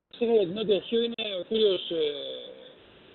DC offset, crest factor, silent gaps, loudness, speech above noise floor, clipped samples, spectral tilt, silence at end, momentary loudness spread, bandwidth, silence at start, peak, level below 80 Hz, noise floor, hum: under 0.1%; 16 dB; none; -27 LUFS; 25 dB; under 0.1%; -3 dB/octave; 0.45 s; 12 LU; 4.4 kHz; 0.15 s; -12 dBFS; -68 dBFS; -52 dBFS; none